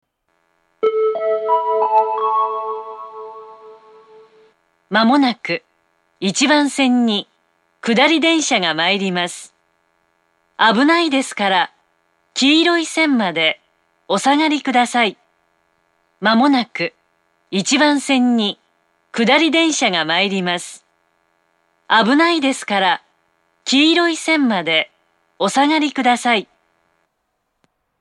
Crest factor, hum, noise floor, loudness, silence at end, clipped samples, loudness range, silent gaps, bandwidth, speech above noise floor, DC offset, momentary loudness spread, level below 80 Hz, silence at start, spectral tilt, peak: 18 dB; none; -71 dBFS; -16 LUFS; 1.55 s; under 0.1%; 4 LU; none; 12 kHz; 56 dB; under 0.1%; 11 LU; -76 dBFS; 0.8 s; -3 dB/octave; 0 dBFS